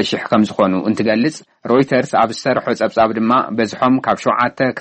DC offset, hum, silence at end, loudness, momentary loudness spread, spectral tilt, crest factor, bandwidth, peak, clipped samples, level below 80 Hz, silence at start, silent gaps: under 0.1%; none; 0 s; -16 LUFS; 4 LU; -5.5 dB/octave; 12 dB; 8.8 kHz; -2 dBFS; under 0.1%; -56 dBFS; 0 s; none